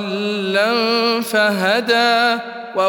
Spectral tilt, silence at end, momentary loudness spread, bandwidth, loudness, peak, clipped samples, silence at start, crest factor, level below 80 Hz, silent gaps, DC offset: -4 dB/octave; 0 s; 7 LU; 18 kHz; -16 LUFS; -2 dBFS; under 0.1%; 0 s; 16 dB; -72 dBFS; none; under 0.1%